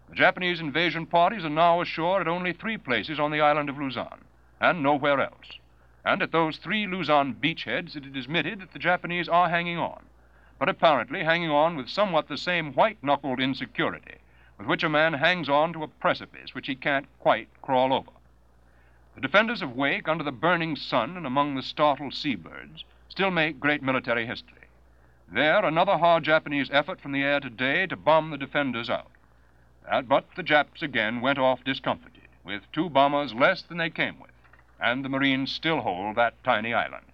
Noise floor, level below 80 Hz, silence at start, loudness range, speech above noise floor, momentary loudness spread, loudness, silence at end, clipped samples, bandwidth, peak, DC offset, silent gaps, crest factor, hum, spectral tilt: -59 dBFS; -60 dBFS; 0.1 s; 3 LU; 33 dB; 9 LU; -25 LUFS; 0.15 s; under 0.1%; 7.4 kHz; -4 dBFS; under 0.1%; none; 22 dB; none; -6.5 dB/octave